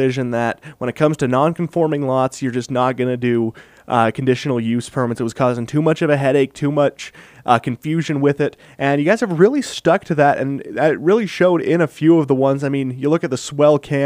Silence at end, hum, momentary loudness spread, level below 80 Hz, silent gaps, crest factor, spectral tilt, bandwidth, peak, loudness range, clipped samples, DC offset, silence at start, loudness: 0 s; none; 7 LU; -58 dBFS; none; 18 dB; -6.5 dB/octave; 15.5 kHz; 0 dBFS; 3 LU; under 0.1%; under 0.1%; 0 s; -18 LUFS